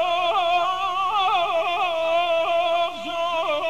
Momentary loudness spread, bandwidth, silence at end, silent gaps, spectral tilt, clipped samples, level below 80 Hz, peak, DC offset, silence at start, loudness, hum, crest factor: 3 LU; 14 kHz; 0 s; none; -2 dB/octave; under 0.1%; -60 dBFS; -10 dBFS; 0.6%; 0 s; -22 LUFS; none; 12 dB